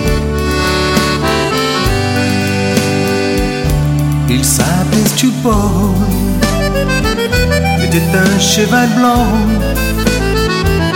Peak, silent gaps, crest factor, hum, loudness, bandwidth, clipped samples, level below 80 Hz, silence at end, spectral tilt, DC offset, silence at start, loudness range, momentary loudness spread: 0 dBFS; none; 12 dB; none; -12 LUFS; 17 kHz; under 0.1%; -22 dBFS; 0 s; -4.5 dB/octave; under 0.1%; 0 s; 2 LU; 4 LU